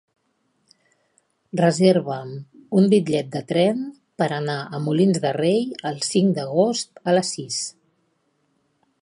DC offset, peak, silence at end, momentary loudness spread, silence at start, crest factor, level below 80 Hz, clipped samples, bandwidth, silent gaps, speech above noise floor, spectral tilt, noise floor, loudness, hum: under 0.1%; -4 dBFS; 1.3 s; 12 LU; 1.55 s; 20 dB; -68 dBFS; under 0.1%; 11.5 kHz; none; 49 dB; -5.5 dB/octave; -69 dBFS; -21 LUFS; none